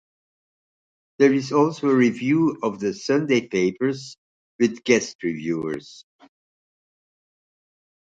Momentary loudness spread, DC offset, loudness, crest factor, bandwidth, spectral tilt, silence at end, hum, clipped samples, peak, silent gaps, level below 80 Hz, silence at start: 9 LU; under 0.1%; -22 LUFS; 20 dB; 8.6 kHz; -5.5 dB/octave; 2.2 s; none; under 0.1%; -4 dBFS; 4.18-4.59 s, 5.15-5.19 s; -66 dBFS; 1.2 s